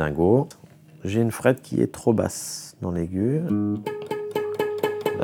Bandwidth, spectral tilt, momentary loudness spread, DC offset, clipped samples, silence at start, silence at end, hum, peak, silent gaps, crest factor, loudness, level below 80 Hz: 19.5 kHz; -6.5 dB/octave; 10 LU; under 0.1%; under 0.1%; 0 s; 0 s; none; -2 dBFS; none; 22 dB; -25 LUFS; -52 dBFS